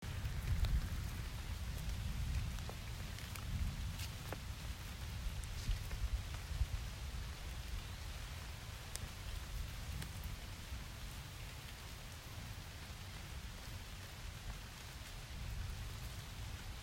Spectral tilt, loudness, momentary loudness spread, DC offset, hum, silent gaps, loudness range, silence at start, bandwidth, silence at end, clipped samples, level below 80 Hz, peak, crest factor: -4 dB/octave; -46 LUFS; 7 LU; under 0.1%; none; none; 6 LU; 0 s; 16 kHz; 0 s; under 0.1%; -46 dBFS; -20 dBFS; 24 dB